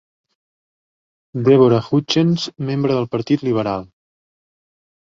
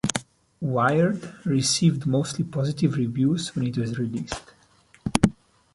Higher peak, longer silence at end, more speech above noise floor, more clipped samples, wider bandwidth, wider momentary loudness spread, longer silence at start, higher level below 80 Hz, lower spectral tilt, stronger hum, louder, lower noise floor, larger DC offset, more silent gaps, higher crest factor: about the same, -2 dBFS vs -2 dBFS; first, 1.2 s vs 0.45 s; first, over 74 dB vs 34 dB; neither; second, 7.6 kHz vs 11.5 kHz; about the same, 10 LU vs 11 LU; first, 1.35 s vs 0.05 s; second, -56 dBFS vs -50 dBFS; first, -7 dB/octave vs -5.5 dB/octave; neither; first, -17 LUFS vs -24 LUFS; first, under -90 dBFS vs -58 dBFS; neither; neither; second, 18 dB vs 24 dB